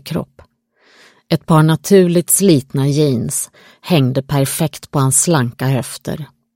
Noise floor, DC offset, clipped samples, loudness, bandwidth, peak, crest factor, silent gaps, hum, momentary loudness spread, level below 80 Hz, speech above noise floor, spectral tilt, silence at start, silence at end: -55 dBFS; under 0.1%; under 0.1%; -15 LUFS; 16.5 kHz; 0 dBFS; 16 dB; none; none; 14 LU; -50 dBFS; 41 dB; -5 dB/octave; 0.05 s; 0.3 s